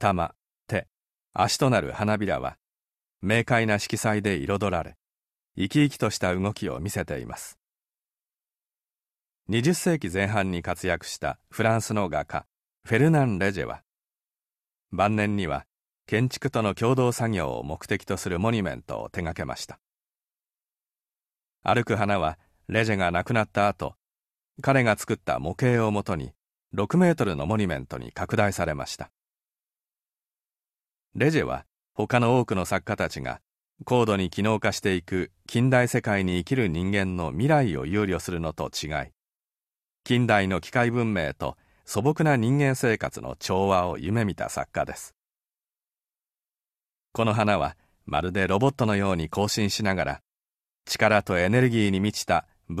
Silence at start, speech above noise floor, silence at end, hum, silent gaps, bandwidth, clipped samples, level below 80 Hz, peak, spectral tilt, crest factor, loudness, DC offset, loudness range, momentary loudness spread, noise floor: 0 s; over 65 dB; 0 s; none; none; 14 kHz; under 0.1%; -50 dBFS; -4 dBFS; -5.5 dB/octave; 22 dB; -25 LUFS; under 0.1%; 6 LU; 12 LU; under -90 dBFS